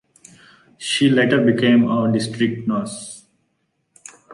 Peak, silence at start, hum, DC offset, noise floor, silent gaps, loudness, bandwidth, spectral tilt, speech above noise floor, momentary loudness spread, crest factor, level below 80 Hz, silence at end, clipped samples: -4 dBFS; 0.8 s; none; under 0.1%; -70 dBFS; none; -18 LUFS; 11.5 kHz; -5.5 dB/octave; 52 dB; 16 LU; 16 dB; -60 dBFS; 0 s; under 0.1%